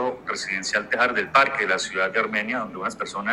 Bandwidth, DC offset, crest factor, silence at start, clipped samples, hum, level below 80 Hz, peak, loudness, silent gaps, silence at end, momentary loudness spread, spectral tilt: 14.5 kHz; under 0.1%; 20 dB; 0 s; under 0.1%; none; -60 dBFS; -4 dBFS; -23 LUFS; none; 0 s; 10 LU; -2.5 dB/octave